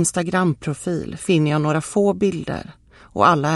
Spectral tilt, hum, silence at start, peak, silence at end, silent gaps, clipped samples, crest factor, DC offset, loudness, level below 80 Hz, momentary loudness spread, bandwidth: -5.5 dB/octave; none; 0 s; -2 dBFS; 0 s; none; under 0.1%; 18 dB; under 0.1%; -20 LUFS; -50 dBFS; 11 LU; 12.5 kHz